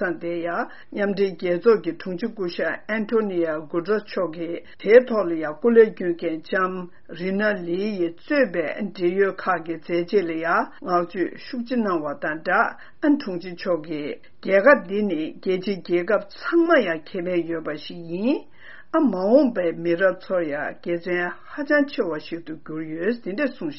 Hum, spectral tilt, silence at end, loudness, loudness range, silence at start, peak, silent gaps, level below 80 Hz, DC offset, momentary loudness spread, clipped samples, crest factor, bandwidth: none; -4.5 dB/octave; 0 s; -23 LUFS; 4 LU; 0 s; -2 dBFS; none; -64 dBFS; 0.8%; 12 LU; under 0.1%; 22 dB; 6 kHz